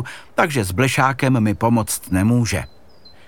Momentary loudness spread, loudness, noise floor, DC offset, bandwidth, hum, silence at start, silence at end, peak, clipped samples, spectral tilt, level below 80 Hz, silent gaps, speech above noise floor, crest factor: 7 LU; -18 LUFS; -49 dBFS; 0.7%; 19 kHz; none; 0 s; 0.6 s; -2 dBFS; under 0.1%; -5.5 dB/octave; -44 dBFS; none; 30 dB; 18 dB